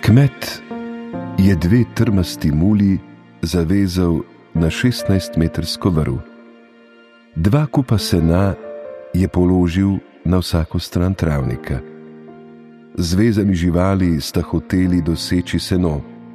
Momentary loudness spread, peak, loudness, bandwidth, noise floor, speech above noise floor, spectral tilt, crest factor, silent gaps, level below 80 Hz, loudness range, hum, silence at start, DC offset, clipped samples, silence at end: 12 LU; -2 dBFS; -18 LUFS; 14.5 kHz; -47 dBFS; 31 dB; -7 dB/octave; 16 dB; none; -34 dBFS; 3 LU; none; 0 s; under 0.1%; under 0.1%; 0 s